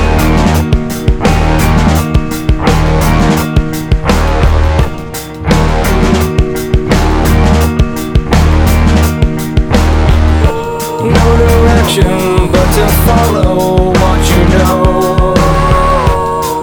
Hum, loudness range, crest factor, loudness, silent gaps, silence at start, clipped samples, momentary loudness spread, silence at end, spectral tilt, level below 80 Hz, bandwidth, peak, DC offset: none; 3 LU; 8 dB; -10 LUFS; none; 0 s; 0.6%; 5 LU; 0 s; -6 dB/octave; -12 dBFS; over 20 kHz; 0 dBFS; under 0.1%